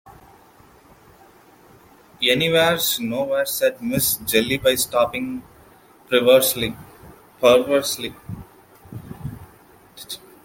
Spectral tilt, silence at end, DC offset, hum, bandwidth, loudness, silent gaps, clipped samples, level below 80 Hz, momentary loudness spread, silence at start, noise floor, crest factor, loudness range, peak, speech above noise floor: -3 dB/octave; 0.25 s; under 0.1%; none; 17 kHz; -19 LUFS; none; under 0.1%; -52 dBFS; 22 LU; 0.05 s; -50 dBFS; 20 dB; 4 LU; -2 dBFS; 31 dB